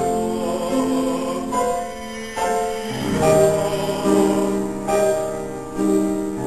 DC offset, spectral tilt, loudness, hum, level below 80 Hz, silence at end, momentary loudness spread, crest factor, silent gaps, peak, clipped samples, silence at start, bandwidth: 0.7%; -5.5 dB/octave; -21 LUFS; none; -46 dBFS; 0 s; 9 LU; 18 dB; none; -4 dBFS; under 0.1%; 0 s; 14 kHz